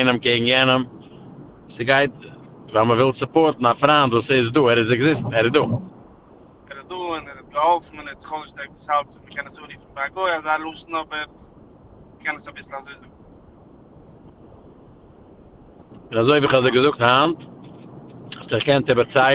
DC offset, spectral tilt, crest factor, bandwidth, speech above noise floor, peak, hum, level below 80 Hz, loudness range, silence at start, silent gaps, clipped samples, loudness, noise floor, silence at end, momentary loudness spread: under 0.1%; -9.5 dB/octave; 20 dB; 4 kHz; 29 dB; -2 dBFS; none; -54 dBFS; 15 LU; 0 s; none; under 0.1%; -19 LUFS; -48 dBFS; 0 s; 20 LU